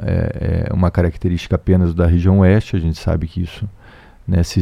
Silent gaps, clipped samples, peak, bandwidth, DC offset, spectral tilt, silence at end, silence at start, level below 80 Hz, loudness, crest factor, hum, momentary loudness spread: none; under 0.1%; 0 dBFS; 10 kHz; under 0.1%; -8 dB/octave; 0 s; 0 s; -28 dBFS; -17 LUFS; 16 dB; none; 12 LU